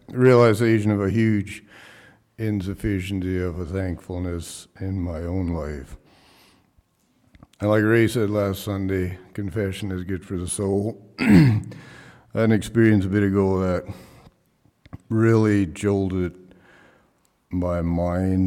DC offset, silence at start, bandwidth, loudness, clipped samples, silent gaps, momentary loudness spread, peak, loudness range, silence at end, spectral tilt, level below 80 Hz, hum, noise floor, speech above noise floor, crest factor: under 0.1%; 0.1 s; 15.5 kHz; -22 LUFS; under 0.1%; none; 14 LU; -6 dBFS; 8 LU; 0 s; -7 dB/octave; -46 dBFS; none; -64 dBFS; 42 dB; 16 dB